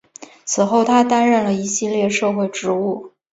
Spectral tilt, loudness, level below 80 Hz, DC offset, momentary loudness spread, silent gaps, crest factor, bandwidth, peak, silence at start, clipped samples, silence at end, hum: -4 dB/octave; -17 LUFS; -62 dBFS; under 0.1%; 9 LU; none; 16 dB; 8 kHz; -2 dBFS; 0.2 s; under 0.1%; 0.25 s; none